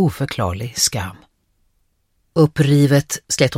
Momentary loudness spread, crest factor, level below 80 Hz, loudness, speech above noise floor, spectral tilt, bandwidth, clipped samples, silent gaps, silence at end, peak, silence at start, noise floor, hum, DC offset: 10 LU; 18 dB; -46 dBFS; -17 LUFS; 48 dB; -5 dB/octave; 16 kHz; under 0.1%; none; 0 s; -2 dBFS; 0 s; -65 dBFS; none; under 0.1%